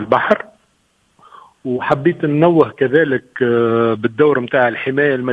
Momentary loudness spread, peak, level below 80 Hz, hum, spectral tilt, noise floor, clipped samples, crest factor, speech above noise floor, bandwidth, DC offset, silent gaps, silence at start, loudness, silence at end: 6 LU; 0 dBFS; -56 dBFS; none; -8.5 dB/octave; -60 dBFS; under 0.1%; 16 dB; 45 dB; 5.4 kHz; under 0.1%; none; 0 s; -15 LUFS; 0 s